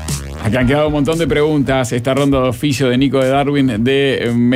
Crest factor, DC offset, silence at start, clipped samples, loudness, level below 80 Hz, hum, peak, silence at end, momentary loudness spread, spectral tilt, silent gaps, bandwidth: 10 dB; under 0.1%; 0 s; under 0.1%; -14 LUFS; -32 dBFS; none; -4 dBFS; 0 s; 3 LU; -6 dB/octave; none; 16 kHz